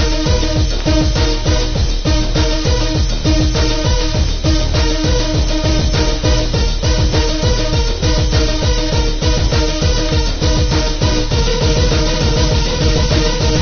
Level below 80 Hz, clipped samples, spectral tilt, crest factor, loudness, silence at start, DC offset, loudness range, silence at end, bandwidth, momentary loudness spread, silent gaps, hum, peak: -16 dBFS; under 0.1%; -5 dB/octave; 14 dB; -15 LUFS; 0 s; under 0.1%; 1 LU; 0 s; 6.8 kHz; 2 LU; none; none; 0 dBFS